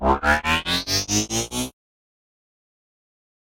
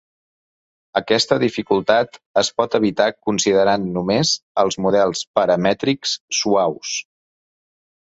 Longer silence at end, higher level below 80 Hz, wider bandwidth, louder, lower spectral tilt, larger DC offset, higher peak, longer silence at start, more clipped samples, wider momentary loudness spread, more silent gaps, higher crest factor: first, 1.75 s vs 1.1 s; first, -38 dBFS vs -56 dBFS; first, 16.5 kHz vs 8.2 kHz; about the same, -21 LUFS vs -19 LUFS; second, -2.5 dB/octave vs -4 dB/octave; neither; about the same, -4 dBFS vs -2 dBFS; second, 0 s vs 0.95 s; neither; first, 9 LU vs 5 LU; second, none vs 2.26-2.34 s, 4.42-4.55 s, 5.27-5.34 s, 6.21-6.28 s; about the same, 20 dB vs 18 dB